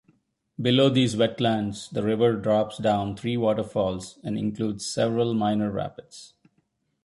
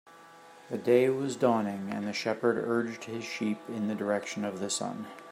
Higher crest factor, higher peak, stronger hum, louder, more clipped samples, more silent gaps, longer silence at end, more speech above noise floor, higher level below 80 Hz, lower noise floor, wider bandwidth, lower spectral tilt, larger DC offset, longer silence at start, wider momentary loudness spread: about the same, 18 dB vs 20 dB; about the same, -8 dBFS vs -10 dBFS; neither; first, -25 LUFS vs -30 LUFS; neither; neither; first, 0.8 s vs 0 s; first, 47 dB vs 23 dB; first, -56 dBFS vs -78 dBFS; first, -72 dBFS vs -53 dBFS; second, 11.5 kHz vs 15.5 kHz; about the same, -6 dB/octave vs -5 dB/octave; neither; first, 0.6 s vs 0.05 s; about the same, 12 LU vs 11 LU